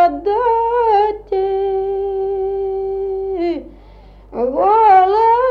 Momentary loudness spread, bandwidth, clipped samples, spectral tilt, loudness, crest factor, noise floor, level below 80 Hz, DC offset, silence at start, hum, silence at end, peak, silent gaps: 11 LU; 5.6 kHz; under 0.1%; -7 dB/octave; -16 LUFS; 14 dB; -41 dBFS; -42 dBFS; under 0.1%; 0 s; 50 Hz at -40 dBFS; 0 s; -2 dBFS; none